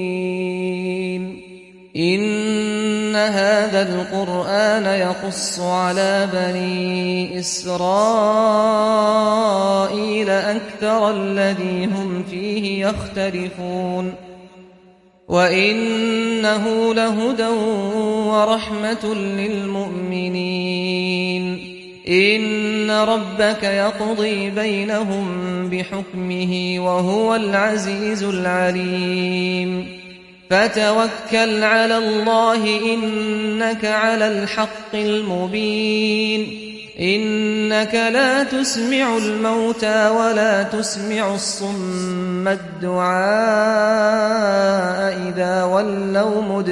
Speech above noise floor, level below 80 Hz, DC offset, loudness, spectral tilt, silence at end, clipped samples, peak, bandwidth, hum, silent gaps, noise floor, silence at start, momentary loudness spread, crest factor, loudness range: 32 dB; -54 dBFS; under 0.1%; -19 LUFS; -4.5 dB/octave; 0 s; under 0.1%; -2 dBFS; 11.5 kHz; none; none; -50 dBFS; 0 s; 8 LU; 16 dB; 4 LU